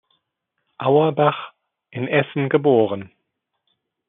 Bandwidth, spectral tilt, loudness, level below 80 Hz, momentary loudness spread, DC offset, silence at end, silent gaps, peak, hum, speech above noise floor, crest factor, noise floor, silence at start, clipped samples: 3.9 kHz; -5.5 dB/octave; -19 LUFS; -72 dBFS; 15 LU; under 0.1%; 1 s; none; -4 dBFS; none; 58 dB; 18 dB; -77 dBFS; 0.8 s; under 0.1%